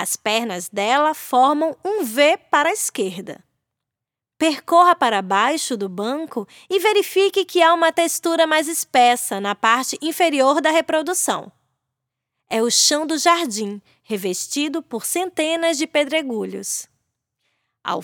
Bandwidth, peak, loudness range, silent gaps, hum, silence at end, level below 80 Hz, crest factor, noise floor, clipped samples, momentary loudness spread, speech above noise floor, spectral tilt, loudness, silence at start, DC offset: over 20 kHz; -2 dBFS; 5 LU; none; none; 0 s; -78 dBFS; 18 dB; -86 dBFS; under 0.1%; 11 LU; 67 dB; -2 dB/octave; -19 LUFS; 0 s; under 0.1%